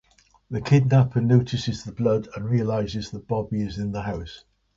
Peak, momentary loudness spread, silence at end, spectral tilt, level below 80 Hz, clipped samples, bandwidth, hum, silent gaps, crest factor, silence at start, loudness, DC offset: -6 dBFS; 12 LU; 0.4 s; -7.5 dB/octave; -48 dBFS; under 0.1%; 7.6 kHz; none; none; 18 dB; 0.5 s; -24 LUFS; under 0.1%